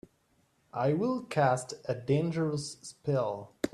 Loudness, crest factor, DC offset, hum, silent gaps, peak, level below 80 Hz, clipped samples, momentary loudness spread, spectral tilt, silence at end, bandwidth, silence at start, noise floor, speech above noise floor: -31 LUFS; 18 dB; under 0.1%; none; none; -14 dBFS; -66 dBFS; under 0.1%; 9 LU; -6.5 dB/octave; 0.05 s; 14 kHz; 0.75 s; -71 dBFS; 40 dB